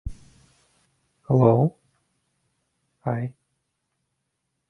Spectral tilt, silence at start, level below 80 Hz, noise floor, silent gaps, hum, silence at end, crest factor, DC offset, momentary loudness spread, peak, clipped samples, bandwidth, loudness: -11 dB/octave; 0.05 s; -48 dBFS; -78 dBFS; none; none; 1.4 s; 22 dB; under 0.1%; 17 LU; -6 dBFS; under 0.1%; 6 kHz; -23 LUFS